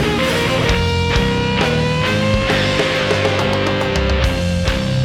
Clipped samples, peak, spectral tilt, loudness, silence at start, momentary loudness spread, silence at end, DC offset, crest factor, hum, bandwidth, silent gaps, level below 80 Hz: under 0.1%; -4 dBFS; -5 dB/octave; -16 LUFS; 0 s; 2 LU; 0 s; under 0.1%; 12 dB; none; 16.5 kHz; none; -26 dBFS